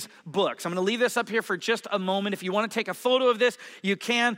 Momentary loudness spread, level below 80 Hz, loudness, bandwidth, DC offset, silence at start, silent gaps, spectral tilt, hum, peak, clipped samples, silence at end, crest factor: 6 LU; -86 dBFS; -26 LUFS; 16 kHz; under 0.1%; 0 s; none; -4 dB/octave; none; -10 dBFS; under 0.1%; 0 s; 16 dB